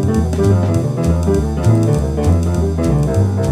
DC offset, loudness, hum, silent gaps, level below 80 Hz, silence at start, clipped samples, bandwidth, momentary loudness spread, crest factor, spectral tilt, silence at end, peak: under 0.1%; -15 LUFS; none; none; -24 dBFS; 0 s; under 0.1%; 14 kHz; 3 LU; 12 dB; -8 dB/octave; 0 s; -2 dBFS